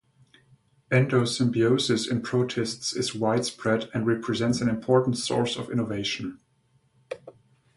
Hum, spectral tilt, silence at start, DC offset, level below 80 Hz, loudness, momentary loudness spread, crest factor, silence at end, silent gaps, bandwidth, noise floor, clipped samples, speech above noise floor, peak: none; -5 dB/octave; 0.9 s; under 0.1%; -60 dBFS; -25 LUFS; 7 LU; 20 dB; 0.45 s; none; 11.5 kHz; -66 dBFS; under 0.1%; 41 dB; -8 dBFS